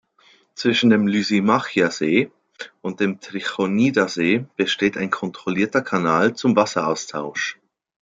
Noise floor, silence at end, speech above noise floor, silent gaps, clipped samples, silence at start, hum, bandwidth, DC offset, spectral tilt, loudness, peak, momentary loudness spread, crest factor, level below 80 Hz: -56 dBFS; 0.5 s; 36 dB; none; under 0.1%; 0.55 s; none; 7.8 kHz; under 0.1%; -5 dB/octave; -20 LUFS; -2 dBFS; 10 LU; 18 dB; -64 dBFS